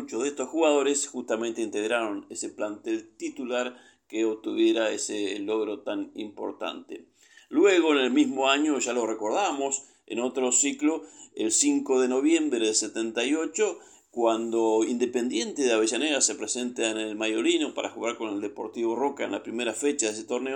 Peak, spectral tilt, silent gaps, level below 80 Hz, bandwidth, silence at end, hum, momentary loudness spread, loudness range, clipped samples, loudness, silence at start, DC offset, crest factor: -8 dBFS; -1.5 dB/octave; none; -80 dBFS; 17 kHz; 0 s; none; 11 LU; 5 LU; under 0.1%; -26 LUFS; 0 s; under 0.1%; 18 dB